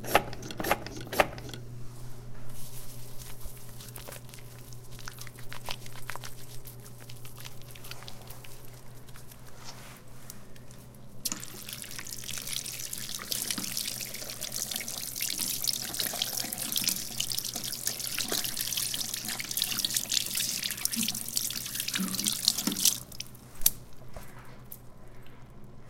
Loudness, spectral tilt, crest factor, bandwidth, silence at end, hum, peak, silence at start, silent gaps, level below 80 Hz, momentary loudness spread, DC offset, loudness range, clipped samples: -30 LUFS; -1.5 dB/octave; 32 dB; 17 kHz; 0 s; 60 Hz at -55 dBFS; -2 dBFS; 0 s; none; -52 dBFS; 21 LU; under 0.1%; 16 LU; under 0.1%